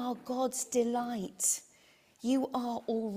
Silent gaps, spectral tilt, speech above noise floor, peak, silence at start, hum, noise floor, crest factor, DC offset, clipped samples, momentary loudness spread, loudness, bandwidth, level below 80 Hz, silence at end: none; -3.5 dB/octave; 31 dB; -16 dBFS; 0 s; none; -64 dBFS; 18 dB; under 0.1%; under 0.1%; 6 LU; -33 LUFS; 16 kHz; -76 dBFS; 0 s